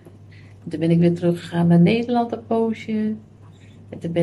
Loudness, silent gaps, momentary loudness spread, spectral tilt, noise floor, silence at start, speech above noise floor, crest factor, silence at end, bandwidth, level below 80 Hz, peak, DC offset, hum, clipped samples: -20 LUFS; none; 17 LU; -8.5 dB/octave; -45 dBFS; 0.05 s; 25 dB; 14 dB; 0 s; 9.8 kHz; -60 dBFS; -6 dBFS; under 0.1%; none; under 0.1%